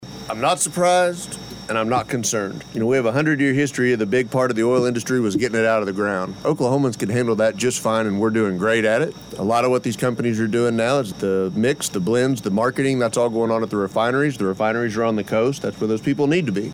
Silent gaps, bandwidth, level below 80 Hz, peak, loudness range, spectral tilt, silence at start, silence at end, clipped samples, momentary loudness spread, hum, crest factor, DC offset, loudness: none; 18.5 kHz; -56 dBFS; -6 dBFS; 1 LU; -5 dB/octave; 0 s; 0 s; under 0.1%; 4 LU; none; 12 dB; under 0.1%; -20 LUFS